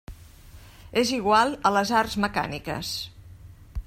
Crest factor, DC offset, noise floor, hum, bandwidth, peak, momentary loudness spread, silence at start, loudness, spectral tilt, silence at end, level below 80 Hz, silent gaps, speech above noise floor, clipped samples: 20 dB; under 0.1%; -47 dBFS; none; 16 kHz; -6 dBFS; 12 LU; 0.1 s; -24 LUFS; -4 dB/octave; 0.05 s; -46 dBFS; none; 23 dB; under 0.1%